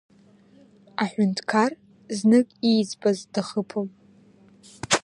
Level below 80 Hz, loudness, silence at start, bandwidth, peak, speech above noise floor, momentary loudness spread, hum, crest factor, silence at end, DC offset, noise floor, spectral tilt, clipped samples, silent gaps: -64 dBFS; -24 LUFS; 1 s; 11 kHz; -4 dBFS; 32 dB; 16 LU; none; 20 dB; 0.05 s; under 0.1%; -55 dBFS; -4.5 dB/octave; under 0.1%; none